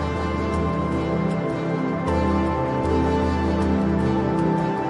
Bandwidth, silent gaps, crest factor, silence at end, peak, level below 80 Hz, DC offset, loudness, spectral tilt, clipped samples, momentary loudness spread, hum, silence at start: 11 kHz; none; 12 dB; 0 s; -10 dBFS; -36 dBFS; under 0.1%; -22 LUFS; -8 dB/octave; under 0.1%; 3 LU; none; 0 s